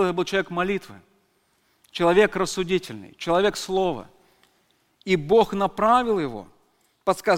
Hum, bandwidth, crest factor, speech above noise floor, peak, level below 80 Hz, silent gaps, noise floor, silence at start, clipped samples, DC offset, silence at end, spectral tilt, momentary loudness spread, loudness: none; 16.5 kHz; 20 dB; 44 dB; -4 dBFS; -52 dBFS; none; -66 dBFS; 0 s; under 0.1%; under 0.1%; 0 s; -5 dB/octave; 14 LU; -23 LUFS